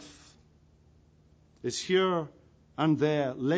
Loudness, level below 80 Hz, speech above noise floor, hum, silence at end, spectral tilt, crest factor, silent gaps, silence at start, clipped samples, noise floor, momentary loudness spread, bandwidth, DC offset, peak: -29 LUFS; -66 dBFS; 34 dB; none; 0 s; -5.5 dB/octave; 16 dB; none; 0 s; under 0.1%; -61 dBFS; 18 LU; 9.8 kHz; under 0.1%; -14 dBFS